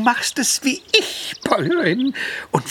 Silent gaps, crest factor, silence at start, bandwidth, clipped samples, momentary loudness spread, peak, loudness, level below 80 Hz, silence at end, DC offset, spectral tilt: none; 20 dB; 0 s; 18.5 kHz; under 0.1%; 8 LU; 0 dBFS; -19 LUFS; -60 dBFS; 0 s; under 0.1%; -3 dB/octave